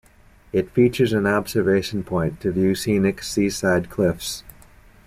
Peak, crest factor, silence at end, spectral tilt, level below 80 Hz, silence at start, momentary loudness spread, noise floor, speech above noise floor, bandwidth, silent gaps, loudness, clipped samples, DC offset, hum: -6 dBFS; 16 dB; 0.55 s; -5.5 dB/octave; -46 dBFS; 0.55 s; 7 LU; -51 dBFS; 31 dB; 16 kHz; none; -21 LUFS; under 0.1%; under 0.1%; none